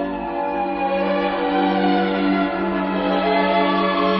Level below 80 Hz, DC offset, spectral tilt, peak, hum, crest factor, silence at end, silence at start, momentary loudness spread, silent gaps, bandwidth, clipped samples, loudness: -48 dBFS; under 0.1%; -9 dB/octave; -6 dBFS; none; 14 dB; 0 s; 0 s; 5 LU; none; 5.8 kHz; under 0.1%; -20 LUFS